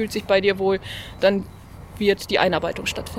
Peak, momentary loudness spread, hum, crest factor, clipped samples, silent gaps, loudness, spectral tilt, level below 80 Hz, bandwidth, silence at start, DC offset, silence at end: -4 dBFS; 11 LU; none; 20 dB; under 0.1%; none; -21 LUFS; -4.5 dB/octave; -44 dBFS; 16.5 kHz; 0 s; under 0.1%; 0 s